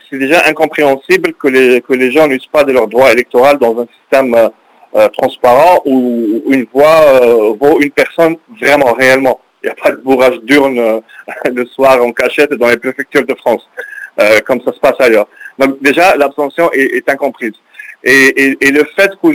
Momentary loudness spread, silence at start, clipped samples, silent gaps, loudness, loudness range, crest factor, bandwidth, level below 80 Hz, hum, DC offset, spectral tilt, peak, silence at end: 8 LU; 0.1 s; 2%; none; -9 LUFS; 3 LU; 10 dB; 16 kHz; -50 dBFS; none; under 0.1%; -4.5 dB/octave; 0 dBFS; 0 s